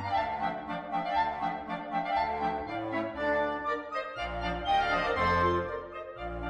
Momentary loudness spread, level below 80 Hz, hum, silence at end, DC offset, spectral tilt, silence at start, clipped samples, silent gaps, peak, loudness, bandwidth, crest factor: 10 LU; -50 dBFS; none; 0 s; under 0.1%; -6 dB/octave; 0 s; under 0.1%; none; -16 dBFS; -31 LUFS; 10 kHz; 16 dB